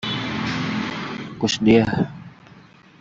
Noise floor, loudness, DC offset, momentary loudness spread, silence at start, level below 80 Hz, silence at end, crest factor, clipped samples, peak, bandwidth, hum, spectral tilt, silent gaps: -48 dBFS; -21 LUFS; under 0.1%; 13 LU; 0 s; -52 dBFS; 0.4 s; 20 dB; under 0.1%; -4 dBFS; 7.8 kHz; none; -5.5 dB/octave; none